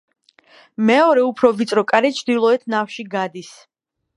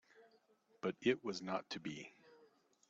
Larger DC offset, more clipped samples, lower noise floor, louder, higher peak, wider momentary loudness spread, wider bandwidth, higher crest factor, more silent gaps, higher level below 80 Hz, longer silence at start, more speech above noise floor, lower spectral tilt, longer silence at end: neither; neither; second, -51 dBFS vs -74 dBFS; first, -17 LUFS vs -42 LUFS; first, 0 dBFS vs -22 dBFS; about the same, 11 LU vs 13 LU; first, 11.5 kHz vs 7.8 kHz; about the same, 18 dB vs 22 dB; neither; first, -70 dBFS vs -84 dBFS; first, 0.8 s vs 0.15 s; about the same, 34 dB vs 32 dB; first, -5 dB/octave vs -3.5 dB/octave; first, 0.7 s vs 0.45 s